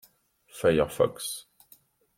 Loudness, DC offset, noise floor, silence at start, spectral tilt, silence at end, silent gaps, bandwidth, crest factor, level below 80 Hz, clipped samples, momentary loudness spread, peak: -27 LUFS; under 0.1%; -62 dBFS; 0.55 s; -4.5 dB/octave; 0.75 s; none; 16.5 kHz; 20 dB; -56 dBFS; under 0.1%; 15 LU; -10 dBFS